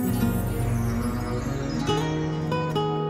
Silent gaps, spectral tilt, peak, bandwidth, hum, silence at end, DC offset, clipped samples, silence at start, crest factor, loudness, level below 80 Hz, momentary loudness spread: none; -6.5 dB/octave; -12 dBFS; 16 kHz; none; 0 s; under 0.1%; under 0.1%; 0 s; 14 dB; -26 LUFS; -38 dBFS; 3 LU